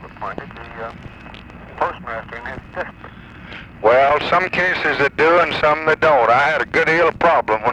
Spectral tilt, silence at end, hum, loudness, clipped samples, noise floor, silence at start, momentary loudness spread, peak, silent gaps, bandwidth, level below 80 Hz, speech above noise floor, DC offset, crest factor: -5.5 dB/octave; 0 s; none; -15 LUFS; under 0.1%; -37 dBFS; 0 s; 21 LU; -2 dBFS; none; 9.8 kHz; -46 dBFS; 20 dB; under 0.1%; 16 dB